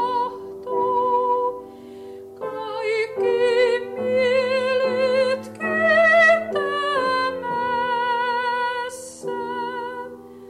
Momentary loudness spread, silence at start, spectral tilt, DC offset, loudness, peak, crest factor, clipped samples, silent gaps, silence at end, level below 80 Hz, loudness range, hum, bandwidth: 17 LU; 0 s; -3.5 dB/octave; under 0.1%; -21 LUFS; -6 dBFS; 14 dB; under 0.1%; none; 0 s; -66 dBFS; 6 LU; 50 Hz at -60 dBFS; 13 kHz